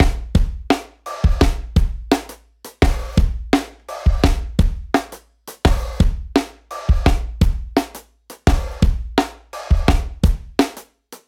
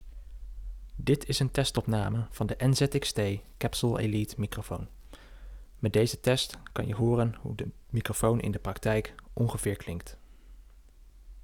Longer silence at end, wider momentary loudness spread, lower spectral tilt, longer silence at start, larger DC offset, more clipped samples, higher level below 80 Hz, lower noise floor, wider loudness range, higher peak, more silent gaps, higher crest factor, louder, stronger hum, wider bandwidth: about the same, 0.1 s vs 0.05 s; second, 15 LU vs 19 LU; about the same, -6 dB/octave vs -5.5 dB/octave; about the same, 0 s vs 0 s; neither; neither; first, -20 dBFS vs -46 dBFS; second, -43 dBFS vs -53 dBFS; about the same, 1 LU vs 3 LU; first, -2 dBFS vs -10 dBFS; neither; about the same, 16 dB vs 20 dB; first, -20 LUFS vs -30 LUFS; neither; second, 16 kHz vs 18 kHz